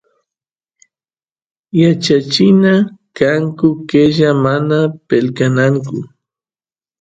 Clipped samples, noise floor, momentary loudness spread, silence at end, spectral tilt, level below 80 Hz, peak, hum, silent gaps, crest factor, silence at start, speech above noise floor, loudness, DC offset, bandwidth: under 0.1%; under -90 dBFS; 8 LU; 0.95 s; -6.5 dB/octave; -52 dBFS; 0 dBFS; none; none; 14 dB; 1.75 s; over 78 dB; -13 LUFS; under 0.1%; 9 kHz